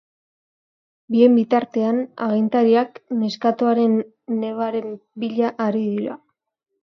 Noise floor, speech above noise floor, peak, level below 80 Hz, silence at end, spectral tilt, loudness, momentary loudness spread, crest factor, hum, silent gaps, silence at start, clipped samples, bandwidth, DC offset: -78 dBFS; 58 dB; -4 dBFS; -74 dBFS; 0.7 s; -7.5 dB/octave; -20 LUFS; 11 LU; 18 dB; none; none; 1.1 s; under 0.1%; 6.4 kHz; under 0.1%